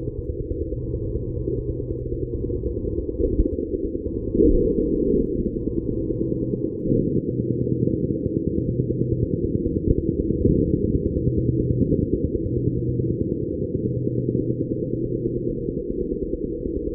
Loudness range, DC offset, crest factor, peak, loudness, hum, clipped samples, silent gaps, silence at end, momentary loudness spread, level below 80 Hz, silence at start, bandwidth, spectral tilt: 4 LU; under 0.1%; 20 dB; -4 dBFS; -24 LUFS; none; under 0.1%; none; 0 s; 7 LU; -32 dBFS; 0 s; 1.1 kHz; -18 dB/octave